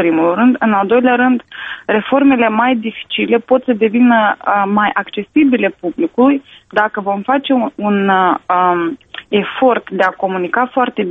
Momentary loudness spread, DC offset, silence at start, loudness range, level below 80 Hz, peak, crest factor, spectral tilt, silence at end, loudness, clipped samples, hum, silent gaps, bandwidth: 8 LU; under 0.1%; 0 s; 2 LU; -56 dBFS; 0 dBFS; 14 dB; -8 dB/octave; 0 s; -14 LUFS; under 0.1%; none; none; 3.9 kHz